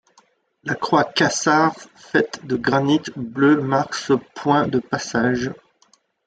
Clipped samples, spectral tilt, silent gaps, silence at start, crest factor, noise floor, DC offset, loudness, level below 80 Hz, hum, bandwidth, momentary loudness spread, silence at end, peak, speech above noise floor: under 0.1%; -4.5 dB/octave; none; 0.65 s; 18 dB; -60 dBFS; under 0.1%; -20 LUFS; -58 dBFS; none; 9.2 kHz; 9 LU; 0.75 s; -2 dBFS; 40 dB